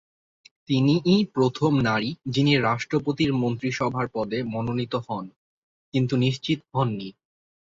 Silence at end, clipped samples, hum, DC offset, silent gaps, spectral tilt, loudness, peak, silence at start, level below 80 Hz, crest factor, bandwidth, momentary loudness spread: 0.55 s; under 0.1%; none; under 0.1%; 5.36-5.92 s; -6.5 dB/octave; -24 LUFS; -8 dBFS; 0.7 s; -56 dBFS; 16 dB; 7.6 kHz; 9 LU